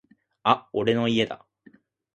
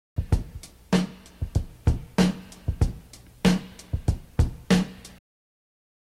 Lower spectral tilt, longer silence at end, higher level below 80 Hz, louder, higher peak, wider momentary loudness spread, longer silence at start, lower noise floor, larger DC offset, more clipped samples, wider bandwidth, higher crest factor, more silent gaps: about the same, -6 dB/octave vs -6 dB/octave; second, 0.8 s vs 1.05 s; second, -62 dBFS vs -34 dBFS; first, -24 LUFS vs -27 LUFS; about the same, -4 dBFS vs -6 dBFS; second, 7 LU vs 12 LU; first, 0.45 s vs 0.15 s; first, -57 dBFS vs -47 dBFS; neither; neither; second, 8.6 kHz vs 15 kHz; about the same, 22 dB vs 20 dB; neither